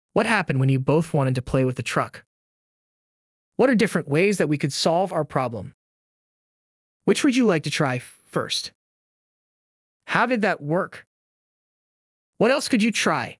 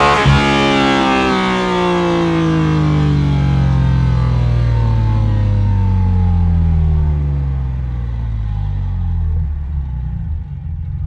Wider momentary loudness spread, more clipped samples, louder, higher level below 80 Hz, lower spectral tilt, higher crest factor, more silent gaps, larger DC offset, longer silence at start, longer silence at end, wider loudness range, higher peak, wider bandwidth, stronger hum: about the same, 10 LU vs 10 LU; neither; second, -22 LUFS vs -15 LUFS; second, -56 dBFS vs -20 dBFS; second, -5.5 dB/octave vs -7 dB/octave; first, 20 dB vs 14 dB; first, 2.26-3.52 s, 5.74-7.00 s, 8.75-10.00 s, 11.07-12.33 s vs none; neither; first, 0.15 s vs 0 s; about the same, 0.05 s vs 0 s; second, 4 LU vs 7 LU; second, -4 dBFS vs 0 dBFS; first, 12 kHz vs 10 kHz; neither